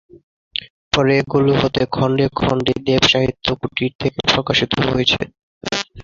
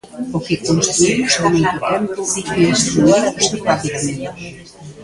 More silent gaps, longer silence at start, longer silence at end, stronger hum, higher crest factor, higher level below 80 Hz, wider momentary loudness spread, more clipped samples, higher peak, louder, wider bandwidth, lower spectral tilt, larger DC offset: first, 0.23-0.51 s, 0.70-0.91 s, 3.95-3.99 s, 5.43-5.61 s vs none; about the same, 0.15 s vs 0.05 s; about the same, 0 s vs 0 s; neither; about the same, 18 dB vs 16 dB; about the same, -42 dBFS vs -46 dBFS; about the same, 12 LU vs 12 LU; neither; about the same, -2 dBFS vs 0 dBFS; about the same, -17 LUFS vs -16 LUFS; second, 7.6 kHz vs 11.5 kHz; about the same, -5 dB/octave vs -4 dB/octave; neither